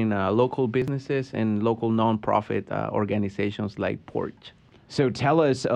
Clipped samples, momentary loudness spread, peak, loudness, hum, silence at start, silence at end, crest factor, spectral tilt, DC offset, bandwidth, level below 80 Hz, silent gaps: under 0.1%; 8 LU; -6 dBFS; -25 LUFS; none; 0 s; 0 s; 18 dB; -7.5 dB/octave; under 0.1%; 9.8 kHz; -58 dBFS; none